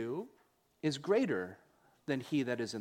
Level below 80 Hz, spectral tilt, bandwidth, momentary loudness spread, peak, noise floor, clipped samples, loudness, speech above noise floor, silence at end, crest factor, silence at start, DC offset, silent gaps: -78 dBFS; -5.5 dB/octave; 16 kHz; 15 LU; -18 dBFS; -71 dBFS; under 0.1%; -36 LUFS; 37 dB; 0 s; 18 dB; 0 s; under 0.1%; none